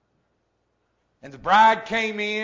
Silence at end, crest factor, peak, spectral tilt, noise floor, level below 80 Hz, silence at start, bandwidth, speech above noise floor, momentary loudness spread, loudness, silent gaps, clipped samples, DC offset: 0 s; 18 dB; -6 dBFS; -3.5 dB/octave; -71 dBFS; -60 dBFS; 1.25 s; 7.6 kHz; 51 dB; 9 LU; -19 LUFS; none; under 0.1%; under 0.1%